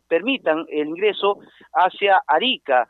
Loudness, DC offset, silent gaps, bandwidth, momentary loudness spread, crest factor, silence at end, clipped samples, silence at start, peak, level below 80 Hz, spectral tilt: -20 LUFS; under 0.1%; none; 4.3 kHz; 8 LU; 16 dB; 0.05 s; under 0.1%; 0.1 s; -4 dBFS; -76 dBFS; -6 dB/octave